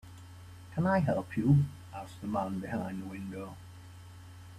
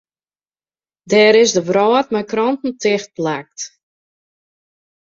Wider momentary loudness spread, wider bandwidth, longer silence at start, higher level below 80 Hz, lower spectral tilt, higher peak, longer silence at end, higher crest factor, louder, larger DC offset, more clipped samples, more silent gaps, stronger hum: first, 24 LU vs 15 LU; first, 13 kHz vs 7.6 kHz; second, 0.05 s vs 1.05 s; about the same, -60 dBFS vs -64 dBFS; first, -8.5 dB/octave vs -3.5 dB/octave; second, -14 dBFS vs -2 dBFS; second, 0 s vs 1.45 s; about the same, 20 dB vs 16 dB; second, -32 LUFS vs -15 LUFS; neither; neither; neither; neither